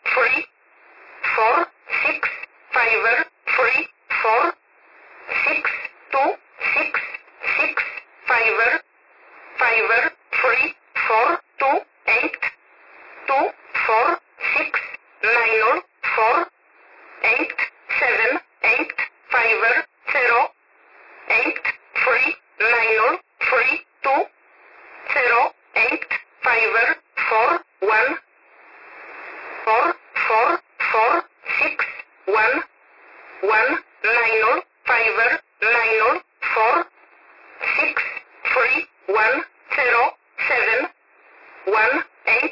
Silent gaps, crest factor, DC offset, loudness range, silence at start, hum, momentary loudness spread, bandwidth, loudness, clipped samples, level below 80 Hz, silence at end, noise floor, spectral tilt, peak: none; 14 dB; under 0.1%; 3 LU; 0.05 s; none; 9 LU; 5.8 kHz; -19 LUFS; under 0.1%; -62 dBFS; 0 s; -53 dBFS; -4 dB/octave; -6 dBFS